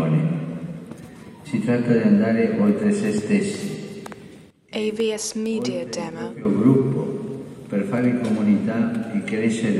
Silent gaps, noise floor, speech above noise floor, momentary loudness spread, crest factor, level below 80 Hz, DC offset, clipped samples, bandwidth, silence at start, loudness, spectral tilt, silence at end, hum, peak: none; -45 dBFS; 25 dB; 17 LU; 18 dB; -62 dBFS; under 0.1%; under 0.1%; 12 kHz; 0 s; -22 LUFS; -6.5 dB/octave; 0 s; none; -4 dBFS